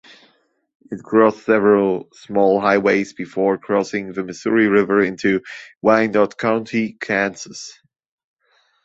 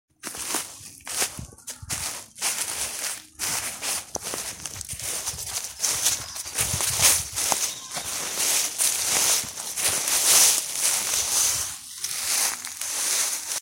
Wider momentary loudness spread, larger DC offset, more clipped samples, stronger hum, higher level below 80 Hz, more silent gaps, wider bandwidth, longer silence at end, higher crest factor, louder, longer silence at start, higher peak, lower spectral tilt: about the same, 13 LU vs 13 LU; neither; neither; neither; second, -60 dBFS vs -54 dBFS; first, 5.77-5.81 s vs none; second, 8 kHz vs 16.5 kHz; first, 1.15 s vs 0 s; second, 18 dB vs 26 dB; first, -18 LUFS vs -23 LUFS; first, 0.9 s vs 0.25 s; about the same, -2 dBFS vs 0 dBFS; first, -6 dB/octave vs 0.5 dB/octave